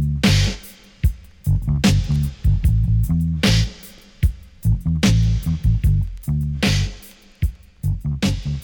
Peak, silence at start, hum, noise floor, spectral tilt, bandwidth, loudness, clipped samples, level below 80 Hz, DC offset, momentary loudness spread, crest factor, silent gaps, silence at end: -6 dBFS; 0 s; none; -42 dBFS; -5.5 dB/octave; 19 kHz; -20 LUFS; under 0.1%; -24 dBFS; under 0.1%; 10 LU; 12 dB; none; 0 s